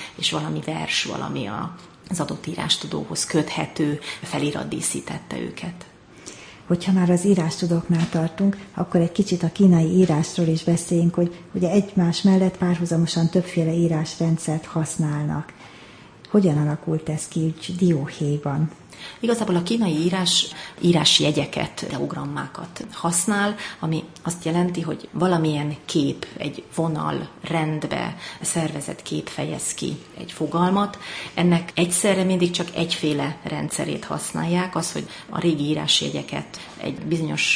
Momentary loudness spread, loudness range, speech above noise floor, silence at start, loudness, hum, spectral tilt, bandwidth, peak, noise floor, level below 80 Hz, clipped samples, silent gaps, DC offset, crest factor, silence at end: 12 LU; 5 LU; 23 dB; 0 s; -23 LUFS; none; -5 dB/octave; 10.5 kHz; -4 dBFS; -45 dBFS; -56 dBFS; under 0.1%; none; under 0.1%; 20 dB; 0 s